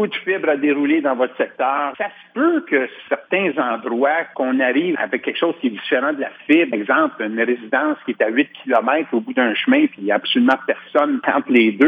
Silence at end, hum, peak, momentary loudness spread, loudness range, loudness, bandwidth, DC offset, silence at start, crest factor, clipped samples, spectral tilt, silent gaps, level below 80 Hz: 0 s; none; -4 dBFS; 5 LU; 2 LU; -19 LUFS; 4.9 kHz; under 0.1%; 0 s; 16 dB; under 0.1%; -7 dB/octave; none; -78 dBFS